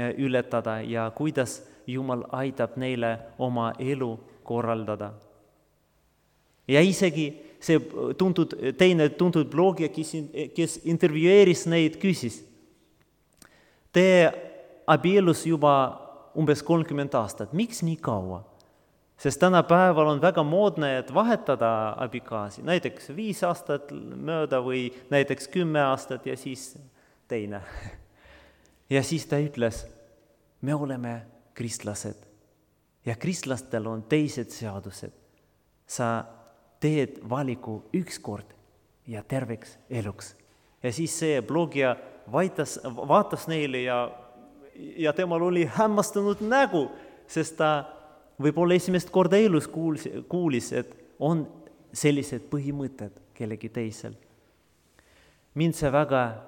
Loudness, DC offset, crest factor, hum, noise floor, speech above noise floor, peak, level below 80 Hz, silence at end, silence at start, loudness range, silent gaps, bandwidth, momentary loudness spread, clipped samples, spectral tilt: -26 LUFS; under 0.1%; 22 dB; none; -67 dBFS; 42 dB; -4 dBFS; -60 dBFS; 0 s; 0 s; 9 LU; none; 18 kHz; 17 LU; under 0.1%; -6 dB/octave